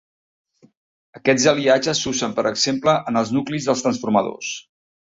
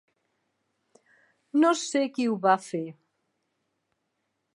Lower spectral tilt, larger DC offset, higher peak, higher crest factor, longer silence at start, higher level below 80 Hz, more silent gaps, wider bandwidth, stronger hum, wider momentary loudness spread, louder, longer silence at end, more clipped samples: about the same, -3.5 dB/octave vs -4.5 dB/octave; neither; first, -2 dBFS vs -8 dBFS; about the same, 18 dB vs 22 dB; second, 1.15 s vs 1.55 s; first, -58 dBFS vs -86 dBFS; neither; second, 8 kHz vs 11.5 kHz; neither; second, 9 LU vs 12 LU; first, -20 LUFS vs -26 LUFS; second, 0.45 s vs 1.65 s; neither